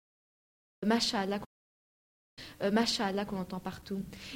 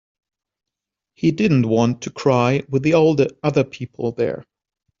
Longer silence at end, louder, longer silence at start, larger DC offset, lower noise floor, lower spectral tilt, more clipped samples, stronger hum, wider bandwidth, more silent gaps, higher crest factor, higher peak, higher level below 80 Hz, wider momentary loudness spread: second, 0 s vs 0.6 s; second, -33 LUFS vs -19 LUFS; second, 0.8 s vs 1.2 s; neither; first, under -90 dBFS vs -84 dBFS; second, -4 dB/octave vs -6.5 dB/octave; neither; neither; first, 16.5 kHz vs 7.6 kHz; first, 1.46-2.37 s vs none; about the same, 20 dB vs 16 dB; second, -14 dBFS vs -2 dBFS; second, -62 dBFS vs -56 dBFS; first, 14 LU vs 10 LU